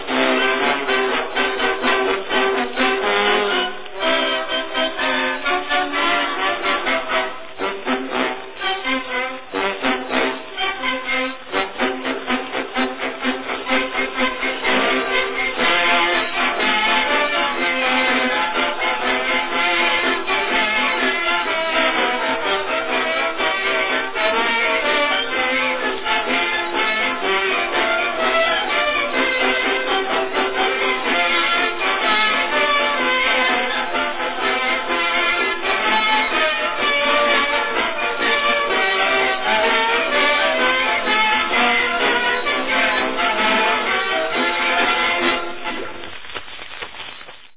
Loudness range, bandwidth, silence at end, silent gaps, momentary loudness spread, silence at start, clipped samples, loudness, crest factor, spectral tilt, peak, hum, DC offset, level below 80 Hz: 5 LU; 4 kHz; 0 s; none; 7 LU; 0 s; under 0.1%; -18 LUFS; 18 dB; -5.5 dB/octave; -2 dBFS; none; under 0.1%; -52 dBFS